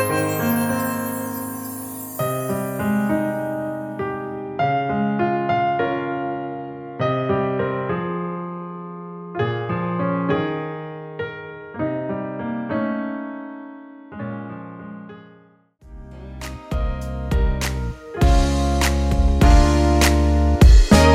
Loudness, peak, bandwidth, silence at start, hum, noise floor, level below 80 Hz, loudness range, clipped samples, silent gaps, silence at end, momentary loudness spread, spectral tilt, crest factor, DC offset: -21 LUFS; 0 dBFS; over 20 kHz; 0 s; none; -52 dBFS; -24 dBFS; 12 LU; under 0.1%; none; 0 s; 18 LU; -6 dB/octave; 20 dB; under 0.1%